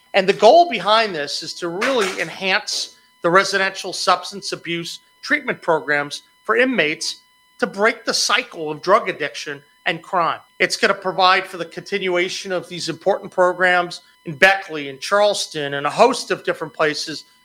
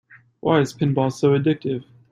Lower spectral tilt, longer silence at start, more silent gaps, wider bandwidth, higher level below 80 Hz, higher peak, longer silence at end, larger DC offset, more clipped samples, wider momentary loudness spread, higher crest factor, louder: second, -2.5 dB/octave vs -7 dB/octave; second, 0.15 s vs 0.45 s; neither; first, 16.5 kHz vs 11.5 kHz; second, -66 dBFS vs -58 dBFS; first, 0 dBFS vs -4 dBFS; about the same, 0.25 s vs 0.3 s; neither; neither; first, 12 LU vs 9 LU; about the same, 20 dB vs 16 dB; about the same, -19 LUFS vs -21 LUFS